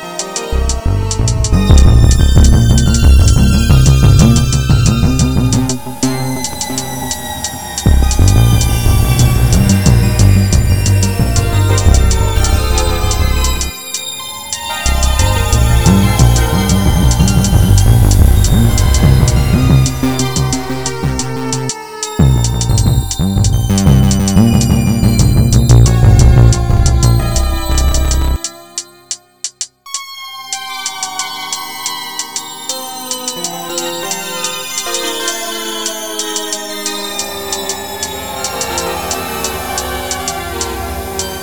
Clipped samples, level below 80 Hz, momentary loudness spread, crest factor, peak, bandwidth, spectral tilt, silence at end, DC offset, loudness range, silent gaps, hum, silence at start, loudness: 0.7%; -16 dBFS; 11 LU; 12 dB; 0 dBFS; over 20 kHz; -5 dB/octave; 0 s; 1%; 9 LU; none; none; 0 s; -13 LUFS